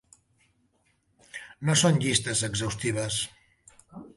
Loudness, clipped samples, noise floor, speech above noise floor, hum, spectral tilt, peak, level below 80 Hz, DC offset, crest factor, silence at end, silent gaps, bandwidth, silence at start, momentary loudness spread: -26 LUFS; under 0.1%; -70 dBFS; 44 dB; none; -3.5 dB/octave; -8 dBFS; -56 dBFS; under 0.1%; 22 dB; 0.1 s; none; 11.5 kHz; 1.35 s; 22 LU